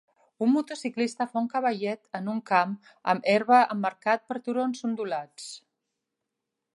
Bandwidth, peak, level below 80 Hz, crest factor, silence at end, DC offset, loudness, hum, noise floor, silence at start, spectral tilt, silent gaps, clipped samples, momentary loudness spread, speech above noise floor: 11.5 kHz; -6 dBFS; -84 dBFS; 20 dB; 1.15 s; under 0.1%; -27 LUFS; none; -85 dBFS; 0.4 s; -5 dB/octave; none; under 0.1%; 13 LU; 58 dB